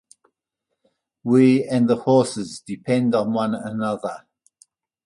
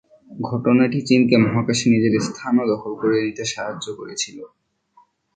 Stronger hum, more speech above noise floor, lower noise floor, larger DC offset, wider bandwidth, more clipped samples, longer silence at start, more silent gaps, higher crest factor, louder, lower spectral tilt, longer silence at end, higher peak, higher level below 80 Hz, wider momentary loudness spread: neither; first, 61 dB vs 38 dB; first, -80 dBFS vs -57 dBFS; neither; first, 11.5 kHz vs 9.2 kHz; neither; first, 1.25 s vs 0.3 s; neither; about the same, 18 dB vs 18 dB; about the same, -20 LUFS vs -20 LUFS; about the same, -6.5 dB/octave vs -5.5 dB/octave; about the same, 0.9 s vs 0.9 s; about the same, -4 dBFS vs -2 dBFS; second, -64 dBFS vs -58 dBFS; first, 16 LU vs 12 LU